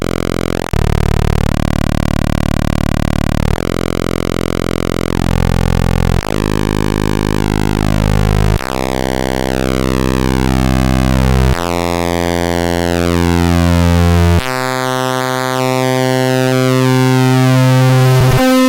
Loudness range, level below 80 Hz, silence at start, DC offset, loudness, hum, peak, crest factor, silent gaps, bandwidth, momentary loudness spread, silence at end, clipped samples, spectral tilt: 3 LU; -20 dBFS; 0 s; under 0.1%; -13 LUFS; none; 0 dBFS; 12 dB; none; 17 kHz; 6 LU; 0 s; under 0.1%; -6 dB/octave